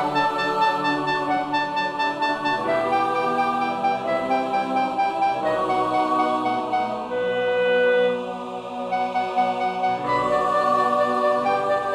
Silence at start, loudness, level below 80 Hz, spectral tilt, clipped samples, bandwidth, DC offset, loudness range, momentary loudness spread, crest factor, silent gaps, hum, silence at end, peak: 0 s; -22 LUFS; -60 dBFS; -5 dB/octave; under 0.1%; 12 kHz; under 0.1%; 1 LU; 5 LU; 14 dB; none; none; 0 s; -8 dBFS